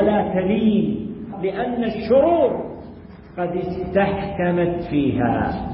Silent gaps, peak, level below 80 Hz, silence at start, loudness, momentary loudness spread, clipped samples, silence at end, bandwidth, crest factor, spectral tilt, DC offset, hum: none; -6 dBFS; -42 dBFS; 0 s; -21 LUFS; 13 LU; under 0.1%; 0 s; 5.6 kHz; 14 dB; -12.5 dB/octave; under 0.1%; none